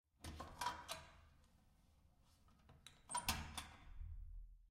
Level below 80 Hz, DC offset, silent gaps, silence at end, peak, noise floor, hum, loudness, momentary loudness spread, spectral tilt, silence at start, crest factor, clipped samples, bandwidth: -60 dBFS; under 0.1%; none; 0 s; -24 dBFS; -73 dBFS; none; -49 LUFS; 20 LU; -2 dB/octave; 0.2 s; 28 dB; under 0.1%; 16 kHz